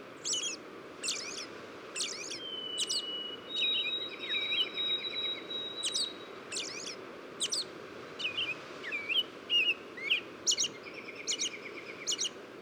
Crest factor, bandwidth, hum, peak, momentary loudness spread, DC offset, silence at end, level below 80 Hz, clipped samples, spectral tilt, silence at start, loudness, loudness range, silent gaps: 20 dB; over 20 kHz; none; -16 dBFS; 13 LU; under 0.1%; 0 s; -80 dBFS; under 0.1%; 0.5 dB/octave; 0 s; -33 LUFS; 4 LU; none